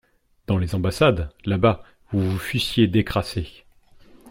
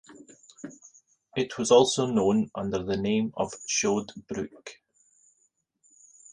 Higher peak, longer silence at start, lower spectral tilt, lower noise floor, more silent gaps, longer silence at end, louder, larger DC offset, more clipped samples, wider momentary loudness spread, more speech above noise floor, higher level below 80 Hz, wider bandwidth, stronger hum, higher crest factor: about the same, -4 dBFS vs -6 dBFS; first, 0.5 s vs 0.1 s; first, -6.5 dB/octave vs -4 dB/octave; second, -50 dBFS vs -72 dBFS; neither; second, 0 s vs 1.6 s; first, -22 LUFS vs -26 LUFS; neither; neither; second, 12 LU vs 24 LU; second, 29 dB vs 46 dB; first, -42 dBFS vs -60 dBFS; first, 16.5 kHz vs 10.5 kHz; neither; about the same, 18 dB vs 22 dB